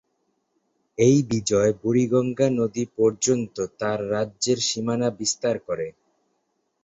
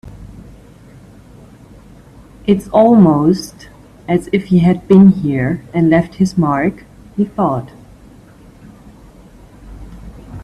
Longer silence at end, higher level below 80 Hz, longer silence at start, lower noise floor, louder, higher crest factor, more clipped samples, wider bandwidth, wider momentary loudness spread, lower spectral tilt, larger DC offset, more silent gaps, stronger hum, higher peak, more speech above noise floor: first, 0.95 s vs 0 s; second, -58 dBFS vs -42 dBFS; first, 1 s vs 0.05 s; first, -73 dBFS vs -41 dBFS; second, -23 LUFS vs -13 LUFS; about the same, 18 dB vs 16 dB; neither; second, 8.4 kHz vs 12 kHz; second, 8 LU vs 26 LU; second, -5 dB/octave vs -8.5 dB/octave; neither; neither; neither; second, -6 dBFS vs 0 dBFS; first, 51 dB vs 29 dB